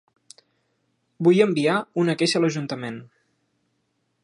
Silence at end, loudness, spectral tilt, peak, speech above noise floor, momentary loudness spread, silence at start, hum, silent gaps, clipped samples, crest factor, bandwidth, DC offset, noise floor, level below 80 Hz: 1.2 s; -21 LUFS; -5.5 dB/octave; -6 dBFS; 51 dB; 14 LU; 1.2 s; none; none; under 0.1%; 20 dB; 11 kHz; under 0.1%; -72 dBFS; -74 dBFS